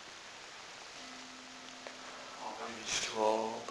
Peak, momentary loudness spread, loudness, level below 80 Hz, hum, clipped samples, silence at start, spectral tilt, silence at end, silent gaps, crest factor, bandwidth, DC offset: -18 dBFS; 16 LU; -40 LUFS; -72 dBFS; none; under 0.1%; 0 s; -1.5 dB/octave; 0 s; none; 22 dB; 11 kHz; under 0.1%